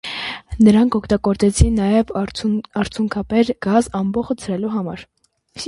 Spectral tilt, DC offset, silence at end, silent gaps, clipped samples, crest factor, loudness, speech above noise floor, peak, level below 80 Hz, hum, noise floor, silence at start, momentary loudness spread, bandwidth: -6 dB/octave; under 0.1%; 0 s; none; under 0.1%; 18 dB; -18 LUFS; 21 dB; 0 dBFS; -30 dBFS; none; -38 dBFS; 0.05 s; 11 LU; 11.5 kHz